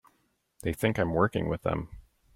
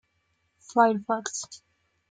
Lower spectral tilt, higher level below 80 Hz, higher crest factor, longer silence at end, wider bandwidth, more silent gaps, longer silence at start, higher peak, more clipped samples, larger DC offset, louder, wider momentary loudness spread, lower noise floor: first, -7 dB/octave vs -3.5 dB/octave; first, -50 dBFS vs -78 dBFS; about the same, 20 dB vs 20 dB; second, 0.35 s vs 0.55 s; first, 16.5 kHz vs 9.6 kHz; neither; about the same, 0.65 s vs 0.7 s; second, -12 dBFS vs -8 dBFS; neither; neither; second, -29 LUFS vs -26 LUFS; second, 10 LU vs 13 LU; about the same, -73 dBFS vs -73 dBFS